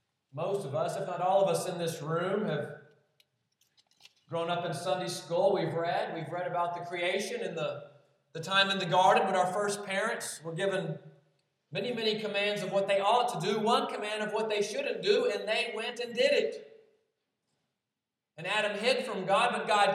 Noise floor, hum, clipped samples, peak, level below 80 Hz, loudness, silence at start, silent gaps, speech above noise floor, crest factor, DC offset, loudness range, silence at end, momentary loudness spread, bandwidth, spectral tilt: -89 dBFS; none; under 0.1%; -12 dBFS; under -90 dBFS; -30 LUFS; 0.35 s; none; 58 dB; 20 dB; under 0.1%; 5 LU; 0 s; 10 LU; 14.5 kHz; -4 dB/octave